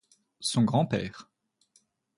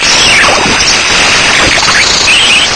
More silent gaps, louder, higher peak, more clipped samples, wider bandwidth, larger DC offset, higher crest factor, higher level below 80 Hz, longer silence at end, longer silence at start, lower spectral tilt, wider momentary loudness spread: neither; second, -28 LUFS vs -4 LUFS; second, -12 dBFS vs 0 dBFS; second, under 0.1% vs 4%; about the same, 11.5 kHz vs 11 kHz; neither; first, 20 dB vs 6 dB; second, -62 dBFS vs -28 dBFS; first, 0.95 s vs 0 s; first, 0.4 s vs 0 s; first, -5.5 dB/octave vs -0.5 dB/octave; first, 15 LU vs 2 LU